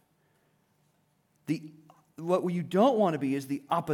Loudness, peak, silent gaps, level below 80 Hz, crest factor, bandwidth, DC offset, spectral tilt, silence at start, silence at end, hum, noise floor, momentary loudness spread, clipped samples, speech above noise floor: -29 LUFS; -12 dBFS; none; -78 dBFS; 18 dB; 17.5 kHz; under 0.1%; -7 dB/octave; 1.5 s; 0 s; none; -71 dBFS; 12 LU; under 0.1%; 43 dB